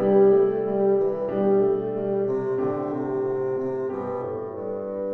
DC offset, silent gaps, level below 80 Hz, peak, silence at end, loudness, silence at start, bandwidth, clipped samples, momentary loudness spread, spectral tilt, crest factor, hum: under 0.1%; none; -62 dBFS; -8 dBFS; 0 s; -24 LUFS; 0 s; 3.2 kHz; under 0.1%; 11 LU; -10.5 dB/octave; 14 dB; none